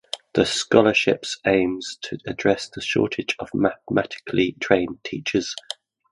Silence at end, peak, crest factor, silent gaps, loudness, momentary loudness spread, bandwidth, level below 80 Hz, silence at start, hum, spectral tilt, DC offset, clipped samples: 0.4 s; 0 dBFS; 22 dB; none; -22 LUFS; 12 LU; 11.5 kHz; -54 dBFS; 0.15 s; none; -4.5 dB/octave; under 0.1%; under 0.1%